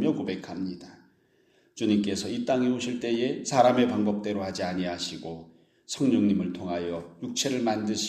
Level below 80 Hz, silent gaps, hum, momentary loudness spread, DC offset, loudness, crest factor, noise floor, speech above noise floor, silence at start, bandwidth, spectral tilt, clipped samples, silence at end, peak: -64 dBFS; none; none; 13 LU; under 0.1%; -27 LUFS; 20 dB; -65 dBFS; 38 dB; 0 s; 13 kHz; -5 dB/octave; under 0.1%; 0 s; -8 dBFS